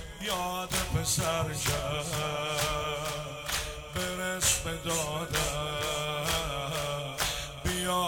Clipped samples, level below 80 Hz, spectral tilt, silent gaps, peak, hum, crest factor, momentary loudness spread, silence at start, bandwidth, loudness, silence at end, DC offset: under 0.1%; -44 dBFS; -2.5 dB/octave; none; -10 dBFS; none; 22 dB; 6 LU; 0 s; 19.5 kHz; -31 LUFS; 0 s; under 0.1%